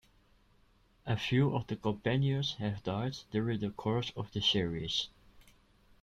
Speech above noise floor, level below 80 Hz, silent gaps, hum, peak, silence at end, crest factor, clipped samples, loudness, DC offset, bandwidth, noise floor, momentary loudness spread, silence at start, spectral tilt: 34 dB; -60 dBFS; none; none; -16 dBFS; 0.6 s; 18 dB; under 0.1%; -33 LUFS; under 0.1%; 7.8 kHz; -67 dBFS; 7 LU; 1.05 s; -6 dB/octave